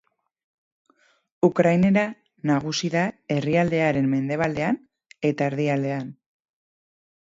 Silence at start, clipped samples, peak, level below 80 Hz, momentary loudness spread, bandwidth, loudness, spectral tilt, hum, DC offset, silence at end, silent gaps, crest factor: 1.45 s; under 0.1%; -6 dBFS; -60 dBFS; 10 LU; 7.8 kHz; -23 LUFS; -6.5 dB/octave; none; under 0.1%; 1.15 s; none; 18 dB